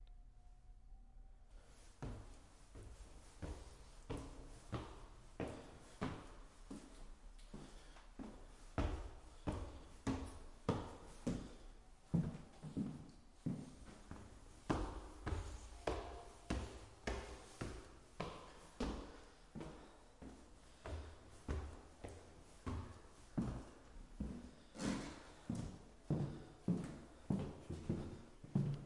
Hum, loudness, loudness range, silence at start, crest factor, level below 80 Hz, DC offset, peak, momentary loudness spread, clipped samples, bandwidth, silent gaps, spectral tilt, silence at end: none; -49 LUFS; 8 LU; 0 s; 26 dB; -56 dBFS; under 0.1%; -22 dBFS; 18 LU; under 0.1%; 11.5 kHz; none; -6.5 dB/octave; 0 s